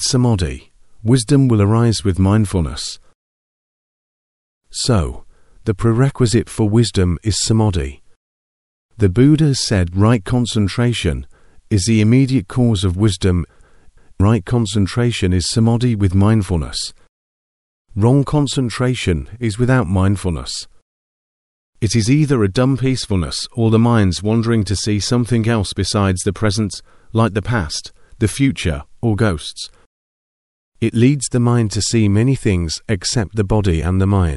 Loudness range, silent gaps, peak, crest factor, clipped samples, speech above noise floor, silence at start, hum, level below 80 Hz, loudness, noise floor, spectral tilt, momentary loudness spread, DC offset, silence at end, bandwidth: 4 LU; 3.15-4.61 s, 8.16-8.89 s, 17.09-17.85 s, 20.82-21.73 s, 29.86-30.72 s; 0 dBFS; 16 dB; under 0.1%; 30 dB; 0 s; none; -34 dBFS; -16 LUFS; -45 dBFS; -6 dB/octave; 10 LU; 0.3%; 0 s; 12 kHz